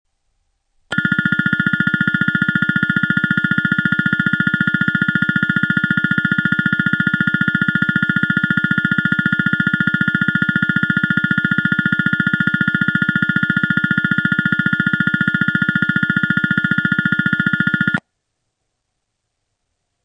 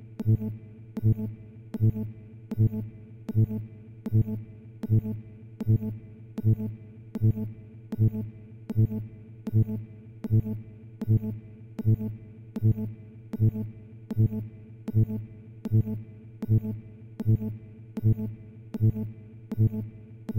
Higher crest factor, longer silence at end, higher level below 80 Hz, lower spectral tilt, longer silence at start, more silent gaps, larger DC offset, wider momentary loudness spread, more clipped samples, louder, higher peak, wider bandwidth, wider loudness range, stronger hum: about the same, 16 dB vs 14 dB; first, 2.05 s vs 0 s; about the same, -50 dBFS vs -50 dBFS; second, -7 dB/octave vs -11.5 dB/octave; first, 0.9 s vs 0 s; neither; neither; second, 0 LU vs 16 LU; neither; first, -16 LUFS vs -29 LUFS; first, 0 dBFS vs -14 dBFS; first, 9 kHz vs 2.6 kHz; about the same, 1 LU vs 1 LU; neither